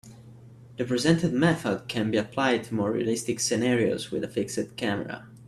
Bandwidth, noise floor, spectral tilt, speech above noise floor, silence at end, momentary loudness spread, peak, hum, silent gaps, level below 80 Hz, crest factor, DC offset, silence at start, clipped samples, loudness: 14 kHz; -48 dBFS; -5 dB/octave; 22 dB; 0.05 s; 8 LU; -6 dBFS; none; none; -60 dBFS; 20 dB; under 0.1%; 0.05 s; under 0.1%; -26 LUFS